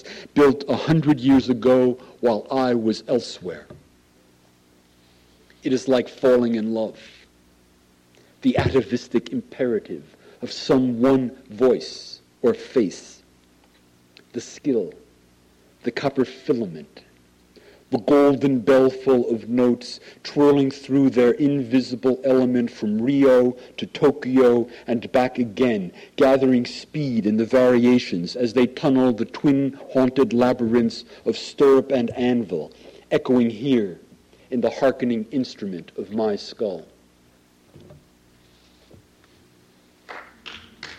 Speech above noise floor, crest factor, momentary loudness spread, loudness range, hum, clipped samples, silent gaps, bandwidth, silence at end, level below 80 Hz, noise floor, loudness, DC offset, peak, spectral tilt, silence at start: 37 dB; 14 dB; 15 LU; 9 LU; 60 Hz at -60 dBFS; under 0.1%; none; 10 kHz; 0.05 s; -56 dBFS; -57 dBFS; -21 LUFS; under 0.1%; -8 dBFS; -7 dB/octave; 0.05 s